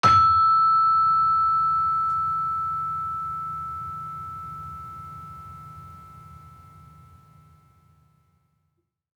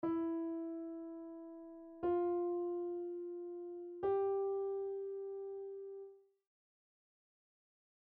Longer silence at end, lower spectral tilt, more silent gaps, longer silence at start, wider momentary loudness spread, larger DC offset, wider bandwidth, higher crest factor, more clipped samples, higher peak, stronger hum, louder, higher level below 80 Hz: first, 2.65 s vs 2 s; second, -4.5 dB/octave vs -7.5 dB/octave; neither; about the same, 0.05 s vs 0 s; first, 23 LU vs 15 LU; neither; first, 9 kHz vs 3.4 kHz; first, 20 dB vs 14 dB; neither; first, -6 dBFS vs -28 dBFS; neither; first, -21 LUFS vs -41 LUFS; first, -56 dBFS vs -78 dBFS